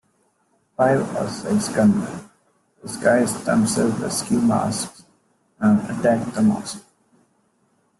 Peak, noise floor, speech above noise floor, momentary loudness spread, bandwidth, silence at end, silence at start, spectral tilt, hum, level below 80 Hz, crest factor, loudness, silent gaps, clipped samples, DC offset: -4 dBFS; -65 dBFS; 45 dB; 14 LU; 12.5 kHz; 1.2 s; 0.8 s; -5.5 dB/octave; none; -58 dBFS; 18 dB; -20 LUFS; none; under 0.1%; under 0.1%